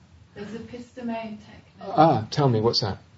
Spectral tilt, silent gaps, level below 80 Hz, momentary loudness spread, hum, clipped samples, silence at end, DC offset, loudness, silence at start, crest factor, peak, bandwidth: -6.5 dB/octave; none; -58 dBFS; 21 LU; none; under 0.1%; 0.2 s; under 0.1%; -23 LUFS; 0.35 s; 22 dB; -4 dBFS; 8 kHz